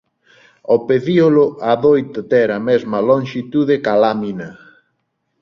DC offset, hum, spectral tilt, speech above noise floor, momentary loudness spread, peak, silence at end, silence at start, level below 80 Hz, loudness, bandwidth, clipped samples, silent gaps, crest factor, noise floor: under 0.1%; none; -8 dB/octave; 55 dB; 10 LU; -2 dBFS; 0.9 s; 0.7 s; -58 dBFS; -15 LUFS; 6.8 kHz; under 0.1%; none; 14 dB; -69 dBFS